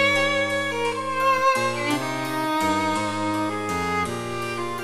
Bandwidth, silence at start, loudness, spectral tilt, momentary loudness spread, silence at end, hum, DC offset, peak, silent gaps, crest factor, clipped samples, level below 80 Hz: 15.5 kHz; 0 s; -23 LUFS; -4 dB/octave; 7 LU; 0 s; none; under 0.1%; -8 dBFS; none; 16 dB; under 0.1%; -56 dBFS